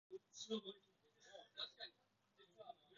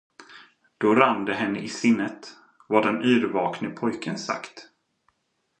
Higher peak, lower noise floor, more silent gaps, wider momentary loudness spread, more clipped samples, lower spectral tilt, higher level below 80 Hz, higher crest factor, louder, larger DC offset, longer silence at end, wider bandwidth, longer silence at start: second, -34 dBFS vs -2 dBFS; first, -80 dBFS vs -74 dBFS; neither; about the same, 14 LU vs 13 LU; neither; second, -2 dB/octave vs -5 dB/octave; second, under -90 dBFS vs -72 dBFS; about the same, 22 dB vs 24 dB; second, -53 LUFS vs -24 LUFS; neither; second, 0 s vs 0.95 s; second, 7.2 kHz vs 9.2 kHz; about the same, 0.1 s vs 0.2 s